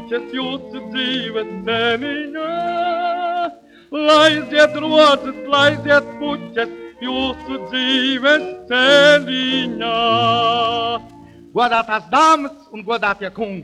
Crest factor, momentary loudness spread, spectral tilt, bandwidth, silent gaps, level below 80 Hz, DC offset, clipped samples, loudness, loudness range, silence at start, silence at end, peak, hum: 16 dB; 13 LU; -4 dB/octave; 11.5 kHz; none; -54 dBFS; under 0.1%; under 0.1%; -16 LUFS; 6 LU; 0 s; 0 s; 0 dBFS; none